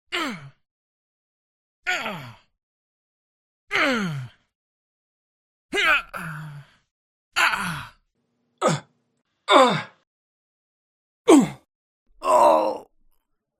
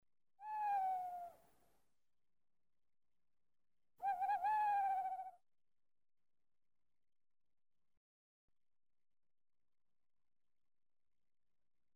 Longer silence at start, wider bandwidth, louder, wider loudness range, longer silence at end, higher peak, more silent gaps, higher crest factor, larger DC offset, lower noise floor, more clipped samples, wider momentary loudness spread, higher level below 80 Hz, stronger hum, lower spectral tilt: second, 0.1 s vs 0.4 s; about the same, 16 kHz vs 16 kHz; first, -21 LUFS vs -41 LUFS; second, 8 LU vs 11 LU; second, 0.8 s vs 6.65 s; first, 0 dBFS vs -32 dBFS; first, 0.71-1.83 s, 2.63-3.67 s, 4.55-5.69 s, 6.91-7.31 s, 10.07-11.25 s, 11.75-12.06 s vs none; first, 24 dB vs 16 dB; neither; second, -72 dBFS vs under -90 dBFS; neither; first, 20 LU vs 16 LU; first, -62 dBFS vs -88 dBFS; neither; first, -4 dB/octave vs -2.5 dB/octave